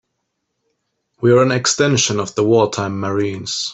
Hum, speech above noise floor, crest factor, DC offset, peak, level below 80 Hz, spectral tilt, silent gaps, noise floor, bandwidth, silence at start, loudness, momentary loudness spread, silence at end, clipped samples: none; 57 dB; 16 dB; under 0.1%; -2 dBFS; -56 dBFS; -4 dB/octave; none; -73 dBFS; 8.4 kHz; 1.2 s; -16 LUFS; 8 LU; 0 s; under 0.1%